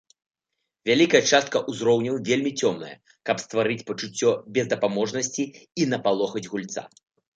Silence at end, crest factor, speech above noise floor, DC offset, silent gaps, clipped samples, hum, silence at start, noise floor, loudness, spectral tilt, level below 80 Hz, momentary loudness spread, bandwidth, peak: 0.5 s; 22 dB; 58 dB; under 0.1%; none; under 0.1%; none; 0.85 s; -82 dBFS; -24 LUFS; -4 dB/octave; -70 dBFS; 13 LU; 9.2 kHz; -4 dBFS